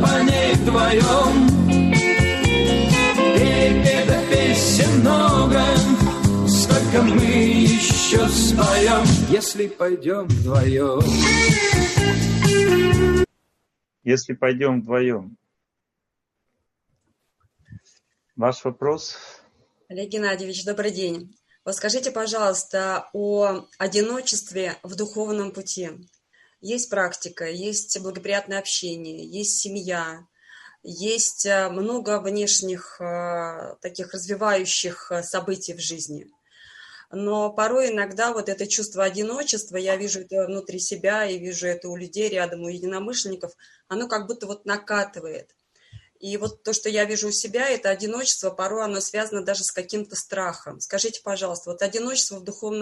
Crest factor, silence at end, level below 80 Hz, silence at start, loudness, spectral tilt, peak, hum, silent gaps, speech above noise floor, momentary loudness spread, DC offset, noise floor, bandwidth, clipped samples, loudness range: 18 dB; 0 s; -38 dBFS; 0 s; -20 LUFS; -4.5 dB/octave; -4 dBFS; none; none; 58 dB; 15 LU; under 0.1%; -81 dBFS; 13 kHz; under 0.1%; 12 LU